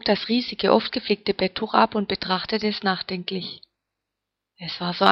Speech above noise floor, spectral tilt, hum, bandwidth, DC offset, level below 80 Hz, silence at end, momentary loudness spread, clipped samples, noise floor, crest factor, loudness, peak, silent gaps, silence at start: 61 dB; -6.5 dB/octave; none; 7.2 kHz; under 0.1%; -58 dBFS; 0 s; 11 LU; under 0.1%; -84 dBFS; 24 dB; -23 LUFS; 0 dBFS; none; 0.05 s